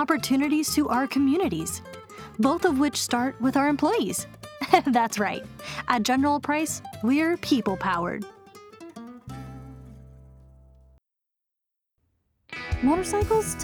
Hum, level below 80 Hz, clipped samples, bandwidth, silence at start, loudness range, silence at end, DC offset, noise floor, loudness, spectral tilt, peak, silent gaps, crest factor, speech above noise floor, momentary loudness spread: none; -48 dBFS; under 0.1%; 19 kHz; 0 s; 18 LU; 0 s; under 0.1%; -84 dBFS; -24 LUFS; -4 dB/octave; -4 dBFS; none; 22 dB; 60 dB; 19 LU